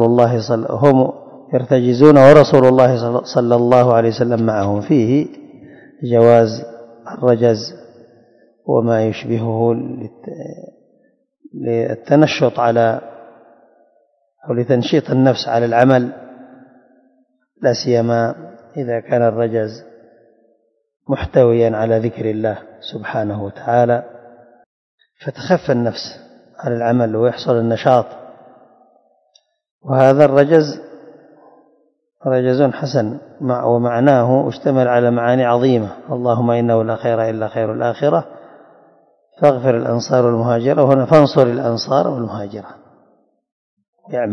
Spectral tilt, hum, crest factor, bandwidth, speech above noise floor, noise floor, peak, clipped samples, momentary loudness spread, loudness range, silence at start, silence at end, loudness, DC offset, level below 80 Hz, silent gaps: -7.5 dB/octave; none; 16 dB; 7.8 kHz; 47 dB; -61 dBFS; 0 dBFS; 0.3%; 17 LU; 9 LU; 0 s; 0 s; -15 LUFS; under 0.1%; -52 dBFS; 24.66-24.98 s, 29.71-29.79 s, 43.52-43.77 s, 43.88-43.93 s